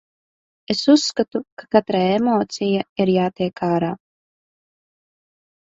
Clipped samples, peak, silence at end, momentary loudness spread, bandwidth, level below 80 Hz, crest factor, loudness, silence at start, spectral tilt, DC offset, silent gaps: under 0.1%; -2 dBFS; 1.8 s; 9 LU; 7.8 kHz; -60 dBFS; 20 dB; -20 LUFS; 0.7 s; -5.5 dB/octave; under 0.1%; 1.52-1.57 s, 2.89-2.96 s